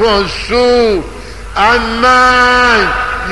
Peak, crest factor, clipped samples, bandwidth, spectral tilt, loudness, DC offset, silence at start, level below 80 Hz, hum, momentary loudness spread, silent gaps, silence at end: 0 dBFS; 10 dB; under 0.1%; 11.5 kHz; -3.5 dB/octave; -9 LUFS; 2%; 0 s; -28 dBFS; none; 12 LU; none; 0 s